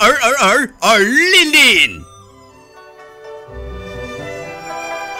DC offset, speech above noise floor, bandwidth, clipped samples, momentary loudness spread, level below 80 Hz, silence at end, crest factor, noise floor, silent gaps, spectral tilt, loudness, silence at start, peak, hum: under 0.1%; 31 dB; 16.5 kHz; under 0.1%; 24 LU; -40 dBFS; 0 s; 14 dB; -43 dBFS; none; -1.5 dB/octave; -10 LUFS; 0 s; -2 dBFS; none